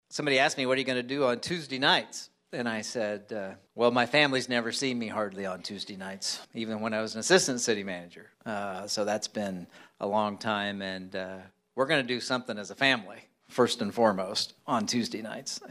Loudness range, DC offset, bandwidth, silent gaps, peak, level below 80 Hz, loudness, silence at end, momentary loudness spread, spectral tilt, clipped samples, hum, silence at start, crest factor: 4 LU; under 0.1%; 14.5 kHz; none; -8 dBFS; -74 dBFS; -29 LUFS; 0.05 s; 14 LU; -3 dB/octave; under 0.1%; none; 0.1 s; 22 dB